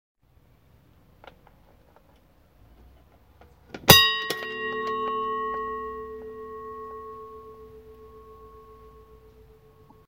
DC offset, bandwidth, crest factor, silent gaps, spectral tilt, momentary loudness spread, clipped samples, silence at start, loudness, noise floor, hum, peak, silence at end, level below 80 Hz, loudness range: under 0.1%; 16 kHz; 30 dB; none; -2.5 dB/octave; 29 LU; under 0.1%; 3.75 s; -22 LUFS; -60 dBFS; none; 0 dBFS; 0.9 s; -52 dBFS; 21 LU